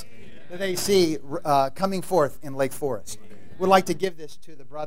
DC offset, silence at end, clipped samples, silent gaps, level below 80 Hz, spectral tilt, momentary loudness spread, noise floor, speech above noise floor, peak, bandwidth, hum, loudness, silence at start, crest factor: 3%; 0 s; under 0.1%; none; -56 dBFS; -4.5 dB/octave; 21 LU; -48 dBFS; 24 dB; -4 dBFS; 16 kHz; none; -24 LUFS; 0.2 s; 22 dB